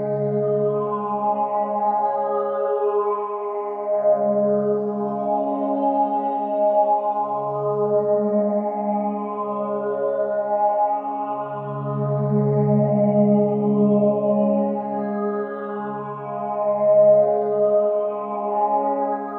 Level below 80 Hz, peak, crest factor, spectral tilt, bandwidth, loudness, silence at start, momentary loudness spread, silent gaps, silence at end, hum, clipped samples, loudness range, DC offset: -70 dBFS; -6 dBFS; 14 dB; -12.5 dB/octave; 3.3 kHz; -21 LUFS; 0 s; 9 LU; none; 0 s; none; under 0.1%; 3 LU; under 0.1%